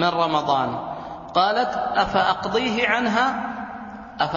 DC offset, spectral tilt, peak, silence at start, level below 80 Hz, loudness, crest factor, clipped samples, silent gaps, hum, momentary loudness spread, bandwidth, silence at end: under 0.1%; -5 dB/octave; -4 dBFS; 0 s; -52 dBFS; -22 LUFS; 18 dB; under 0.1%; none; none; 13 LU; 7.4 kHz; 0 s